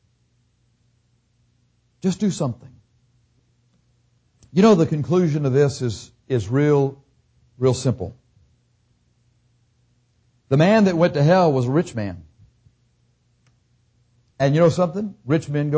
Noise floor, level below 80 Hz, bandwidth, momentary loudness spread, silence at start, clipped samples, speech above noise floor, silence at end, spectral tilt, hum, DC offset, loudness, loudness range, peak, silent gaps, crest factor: -64 dBFS; -52 dBFS; 8 kHz; 13 LU; 2.05 s; under 0.1%; 46 dB; 0 s; -7 dB/octave; 60 Hz at -45 dBFS; under 0.1%; -20 LUFS; 10 LU; -6 dBFS; none; 16 dB